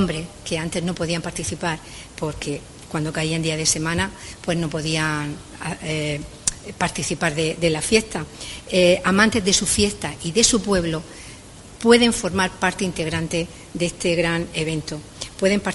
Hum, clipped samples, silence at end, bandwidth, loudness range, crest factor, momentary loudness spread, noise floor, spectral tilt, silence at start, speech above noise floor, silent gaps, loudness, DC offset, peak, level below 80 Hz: none; under 0.1%; 0 s; 11.5 kHz; 6 LU; 22 dB; 15 LU; -41 dBFS; -3.5 dB/octave; 0 s; 19 dB; none; -21 LUFS; under 0.1%; 0 dBFS; -44 dBFS